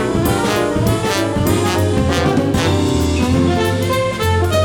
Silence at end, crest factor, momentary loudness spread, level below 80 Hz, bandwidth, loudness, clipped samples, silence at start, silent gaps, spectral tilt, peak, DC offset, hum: 0 s; 14 dB; 2 LU; -30 dBFS; 19 kHz; -16 LUFS; under 0.1%; 0 s; none; -5.5 dB/octave; -2 dBFS; under 0.1%; none